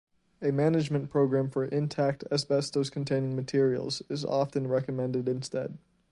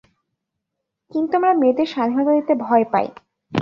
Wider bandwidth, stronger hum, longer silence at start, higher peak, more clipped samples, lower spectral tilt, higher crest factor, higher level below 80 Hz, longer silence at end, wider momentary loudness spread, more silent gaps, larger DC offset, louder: first, 11.5 kHz vs 6.8 kHz; neither; second, 0.4 s vs 1.15 s; second, -12 dBFS vs -2 dBFS; neither; about the same, -6.5 dB/octave vs -7.5 dB/octave; about the same, 16 dB vs 18 dB; about the same, -66 dBFS vs -66 dBFS; first, 0.35 s vs 0 s; second, 7 LU vs 10 LU; neither; neither; second, -29 LUFS vs -19 LUFS